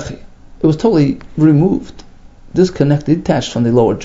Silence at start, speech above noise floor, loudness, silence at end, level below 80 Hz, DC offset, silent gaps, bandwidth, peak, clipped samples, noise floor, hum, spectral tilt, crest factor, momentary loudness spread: 0 s; 25 dB; -14 LUFS; 0 s; -38 dBFS; under 0.1%; none; 7.8 kHz; 0 dBFS; under 0.1%; -37 dBFS; none; -7.5 dB/octave; 14 dB; 9 LU